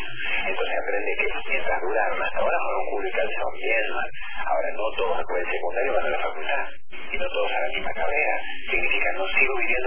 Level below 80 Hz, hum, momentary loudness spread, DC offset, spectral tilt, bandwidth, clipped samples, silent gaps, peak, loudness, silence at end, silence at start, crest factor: -48 dBFS; none; 6 LU; 6%; -7 dB/octave; 3.5 kHz; under 0.1%; none; -6 dBFS; -25 LUFS; 0 s; 0 s; 18 dB